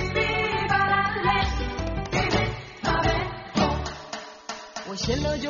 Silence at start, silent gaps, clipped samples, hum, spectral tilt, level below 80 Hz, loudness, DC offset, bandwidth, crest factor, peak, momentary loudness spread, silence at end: 0 s; none; under 0.1%; none; -3.5 dB/octave; -36 dBFS; -25 LUFS; under 0.1%; 7.2 kHz; 18 dB; -8 dBFS; 13 LU; 0 s